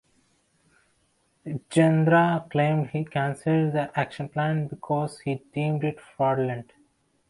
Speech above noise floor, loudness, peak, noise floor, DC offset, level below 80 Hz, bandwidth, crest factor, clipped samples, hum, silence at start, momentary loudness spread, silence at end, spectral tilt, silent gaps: 44 dB; -25 LUFS; -8 dBFS; -68 dBFS; under 0.1%; -64 dBFS; 11.5 kHz; 18 dB; under 0.1%; none; 1.45 s; 11 LU; 0.65 s; -7.5 dB/octave; none